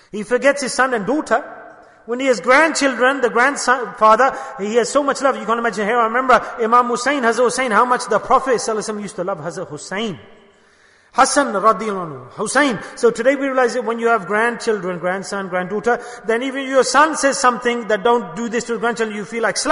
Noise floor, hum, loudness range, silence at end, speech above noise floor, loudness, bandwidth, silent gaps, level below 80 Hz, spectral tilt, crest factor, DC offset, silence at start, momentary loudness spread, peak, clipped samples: -52 dBFS; none; 4 LU; 0 s; 35 dB; -17 LUFS; 11 kHz; none; -56 dBFS; -3 dB/octave; 16 dB; under 0.1%; 0.15 s; 10 LU; -2 dBFS; under 0.1%